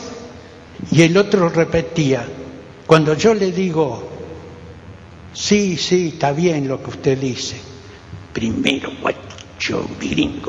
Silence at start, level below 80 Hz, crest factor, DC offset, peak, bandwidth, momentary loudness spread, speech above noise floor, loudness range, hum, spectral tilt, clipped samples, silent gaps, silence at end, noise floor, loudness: 0 s; -46 dBFS; 18 dB; under 0.1%; 0 dBFS; 10 kHz; 23 LU; 21 dB; 6 LU; none; -5.5 dB/octave; under 0.1%; none; 0 s; -38 dBFS; -17 LUFS